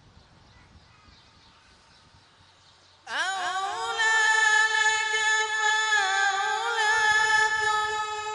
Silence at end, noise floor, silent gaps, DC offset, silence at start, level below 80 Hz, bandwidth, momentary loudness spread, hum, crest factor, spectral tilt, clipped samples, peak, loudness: 0 s; -57 dBFS; none; under 0.1%; 3.05 s; -66 dBFS; 11 kHz; 9 LU; none; 16 dB; 1.5 dB/octave; under 0.1%; -10 dBFS; -23 LUFS